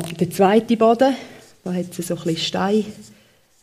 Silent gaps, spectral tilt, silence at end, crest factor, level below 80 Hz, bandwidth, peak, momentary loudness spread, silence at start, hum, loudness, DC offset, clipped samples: none; -5.5 dB/octave; 0.6 s; 20 dB; -62 dBFS; 15.5 kHz; -2 dBFS; 13 LU; 0 s; none; -19 LUFS; under 0.1%; under 0.1%